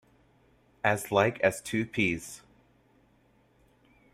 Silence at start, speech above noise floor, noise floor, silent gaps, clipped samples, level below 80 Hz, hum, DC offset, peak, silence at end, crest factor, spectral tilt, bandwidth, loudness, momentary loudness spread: 0.85 s; 37 dB; -65 dBFS; none; under 0.1%; -62 dBFS; none; under 0.1%; -8 dBFS; 1.75 s; 24 dB; -5 dB/octave; 15.5 kHz; -28 LUFS; 13 LU